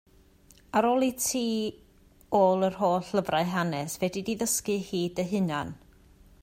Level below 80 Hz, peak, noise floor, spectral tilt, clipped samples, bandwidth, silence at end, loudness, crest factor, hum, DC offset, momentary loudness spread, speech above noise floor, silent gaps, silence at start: -60 dBFS; -10 dBFS; -58 dBFS; -4.5 dB/octave; under 0.1%; 16 kHz; 0.65 s; -28 LUFS; 18 dB; none; under 0.1%; 7 LU; 31 dB; none; 0.75 s